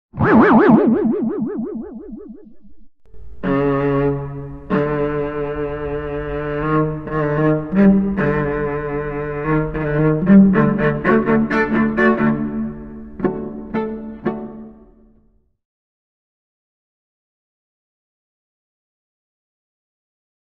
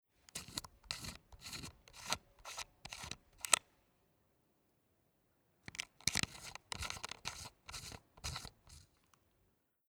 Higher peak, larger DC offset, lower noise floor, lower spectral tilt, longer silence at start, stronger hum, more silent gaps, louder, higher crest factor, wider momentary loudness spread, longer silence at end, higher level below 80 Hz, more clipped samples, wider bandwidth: first, 0 dBFS vs -6 dBFS; neither; second, -57 dBFS vs -78 dBFS; first, -10 dB/octave vs -1 dB/octave; second, 0.15 s vs 0.35 s; neither; neither; first, -17 LUFS vs -42 LUFS; second, 18 dB vs 40 dB; about the same, 16 LU vs 17 LU; first, 5.85 s vs 1.05 s; first, -40 dBFS vs -64 dBFS; neither; second, 5.2 kHz vs over 20 kHz